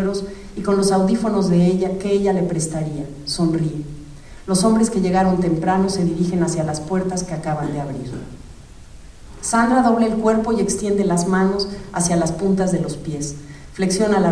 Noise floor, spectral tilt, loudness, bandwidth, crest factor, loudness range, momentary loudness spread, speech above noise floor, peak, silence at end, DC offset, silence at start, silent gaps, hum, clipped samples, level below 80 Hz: -39 dBFS; -5.5 dB/octave; -19 LUFS; 11 kHz; 16 dB; 4 LU; 12 LU; 20 dB; -4 dBFS; 0 s; under 0.1%; 0 s; none; none; under 0.1%; -40 dBFS